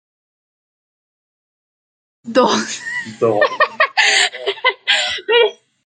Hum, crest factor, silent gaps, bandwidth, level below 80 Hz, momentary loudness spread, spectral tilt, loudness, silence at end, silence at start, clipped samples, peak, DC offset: none; 18 dB; none; 9.4 kHz; -68 dBFS; 7 LU; -1.5 dB/octave; -15 LUFS; 0.3 s; 2.25 s; under 0.1%; 0 dBFS; under 0.1%